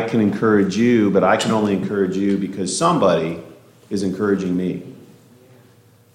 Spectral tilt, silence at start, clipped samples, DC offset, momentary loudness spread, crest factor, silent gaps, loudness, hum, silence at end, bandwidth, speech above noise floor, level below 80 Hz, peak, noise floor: -5.5 dB/octave; 0 s; under 0.1%; under 0.1%; 11 LU; 16 dB; none; -18 LUFS; none; 1.15 s; 13.5 kHz; 33 dB; -60 dBFS; -4 dBFS; -51 dBFS